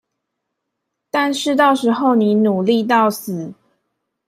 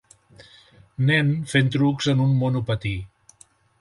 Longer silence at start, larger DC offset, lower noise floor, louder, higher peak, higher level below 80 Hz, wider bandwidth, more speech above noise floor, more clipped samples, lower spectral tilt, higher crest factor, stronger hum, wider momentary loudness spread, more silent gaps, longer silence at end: first, 1.15 s vs 1 s; neither; first, -77 dBFS vs -56 dBFS; first, -16 LUFS vs -22 LUFS; first, -2 dBFS vs -6 dBFS; second, -68 dBFS vs -50 dBFS; first, 15.5 kHz vs 11.5 kHz; first, 61 dB vs 35 dB; neither; second, -5 dB/octave vs -6.5 dB/octave; about the same, 16 dB vs 16 dB; neither; about the same, 12 LU vs 10 LU; neither; about the same, 0.75 s vs 0.75 s